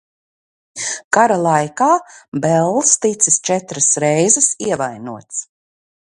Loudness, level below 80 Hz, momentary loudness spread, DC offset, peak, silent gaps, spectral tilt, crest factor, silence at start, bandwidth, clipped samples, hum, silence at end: -15 LUFS; -62 dBFS; 13 LU; under 0.1%; 0 dBFS; 1.04-1.11 s, 2.28-2.32 s; -3.5 dB/octave; 18 dB; 0.75 s; 11.5 kHz; under 0.1%; none; 0.6 s